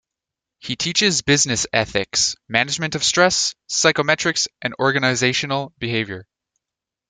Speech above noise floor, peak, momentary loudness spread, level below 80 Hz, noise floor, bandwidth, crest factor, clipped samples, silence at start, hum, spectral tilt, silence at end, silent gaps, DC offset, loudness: 66 dB; 0 dBFS; 8 LU; -54 dBFS; -86 dBFS; 11 kHz; 20 dB; under 0.1%; 0.65 s; none; -2.5 dB/octave; 0.9 s; none; under 0.1%; -18 LUFS